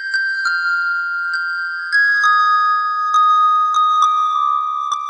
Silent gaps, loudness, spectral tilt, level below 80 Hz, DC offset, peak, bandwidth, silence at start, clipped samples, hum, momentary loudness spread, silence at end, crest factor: none; -15 LUFS; 4.5 dB/octave; -78 dBFS; under 0.1%; -4 dBFS; 10.5 kHz; 0 s; under 0.1%; none; 7 LU; 0 s; 12 dB